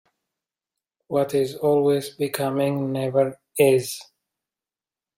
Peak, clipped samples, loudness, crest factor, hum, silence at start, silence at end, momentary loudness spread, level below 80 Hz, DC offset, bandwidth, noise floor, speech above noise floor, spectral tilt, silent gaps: -6 dBFS; under 0.1%; -22 LUFS; 18 dB; none; 1.1 s; 1.15 s; 8 LU; -68 dBFS; under 0.1%; 16.5 kHz; under -90 dBFS; over 68 dB; -5.5 dB/octave; none